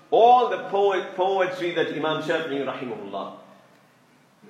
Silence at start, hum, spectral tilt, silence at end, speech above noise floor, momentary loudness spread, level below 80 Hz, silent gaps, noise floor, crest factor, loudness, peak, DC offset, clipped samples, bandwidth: 0.1 s; none; -5.5 dB/octave; 1.1 s; 36 dB; 16 LU; -82 dBFS; none; -58 dBFS; 20 dB; -23 LUFS; -4 dBFS; under 0.1%; under 0.1%; 9.6 kHz